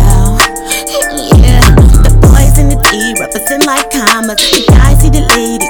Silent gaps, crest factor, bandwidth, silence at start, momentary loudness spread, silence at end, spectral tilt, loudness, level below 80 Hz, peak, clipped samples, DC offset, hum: none; 6 dB; over 20 kHz; 0 s; 8 LU; 0 s; -4.5 dB/octave; -7 LUFS; -8 dBFS; 0 dBFS; 10%; under 0.1%; none